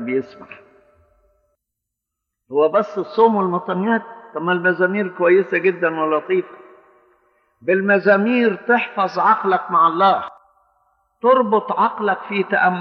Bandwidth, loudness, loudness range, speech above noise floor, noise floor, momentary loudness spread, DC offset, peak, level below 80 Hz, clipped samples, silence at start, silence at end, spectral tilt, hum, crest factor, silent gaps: 6.2 kHz; -18 LUFS; 4 LU; 63 dB; -81 dBFS; 8 LU; under 0.1%; -2 dBFS; -70 dBFS; under 0.1%; 0 s; 0 s; -8 dB/octave; none; 16 dB; none